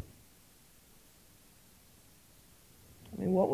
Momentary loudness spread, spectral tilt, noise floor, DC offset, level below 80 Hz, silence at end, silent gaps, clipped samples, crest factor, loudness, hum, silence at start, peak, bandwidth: 24 LU; -8 dB/octave; -62 dBFS; under 0.1%; -66 dBFS; 0 s; none; under 0.1%; 22 dB; -35 LUFS; none; 0 s; -16 dBFS; 16 kHz